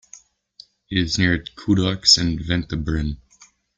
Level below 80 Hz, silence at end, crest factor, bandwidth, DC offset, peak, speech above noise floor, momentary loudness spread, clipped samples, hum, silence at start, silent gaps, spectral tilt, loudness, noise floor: -38 dBFS; 0.6 s; 22 dB; 9.6 kHz; under 0.1%; 0 dBFS; 34 dB; 11 LU; under 0.1%; none; 0.9 s; none; -3.5 dB/octave; -20 LUFS; -54 dBFS